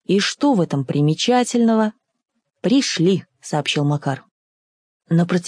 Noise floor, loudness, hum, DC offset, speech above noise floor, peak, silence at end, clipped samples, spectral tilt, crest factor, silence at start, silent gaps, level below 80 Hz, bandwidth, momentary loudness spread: under -90 dBFS; -19 LUFS; none; under 0.1%; over 72 dB; -4 dBFS; 0 s; under 0.1%; -5.5 dB/octave; 14 dB; 0.1 s; 4.31-5.00 s; -70 dBFS; 10.5 kHz; 8 LU